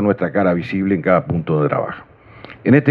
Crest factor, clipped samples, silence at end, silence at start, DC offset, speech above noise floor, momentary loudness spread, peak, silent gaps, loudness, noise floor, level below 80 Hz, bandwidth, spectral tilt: 18 dB; under 0.1%; 0 s; 0 s; under 0.1%; 24 dB; 8 LU; 0 dBFS; none; -18 LUFS; -40 dBFS; -50 dBFS; 5.6 kHz; -10.5 dB/octave